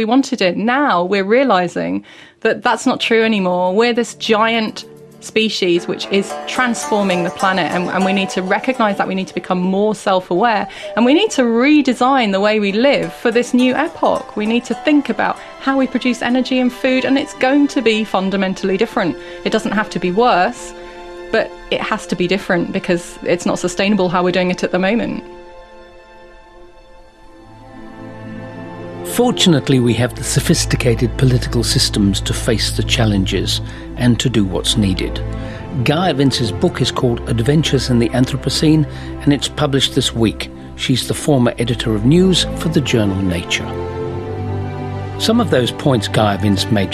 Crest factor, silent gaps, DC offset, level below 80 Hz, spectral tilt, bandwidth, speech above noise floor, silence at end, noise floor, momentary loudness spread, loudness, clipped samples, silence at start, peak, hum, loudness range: 16 dB; none; under 0.1%; -34 dBFS; -5 dB/octave; 14 kHz; 26 dB; 0 s; -41 dBFS; 9 LU; -16 LUFS; under 0.1%; 0 s; 0 dBFS; none; 4 LU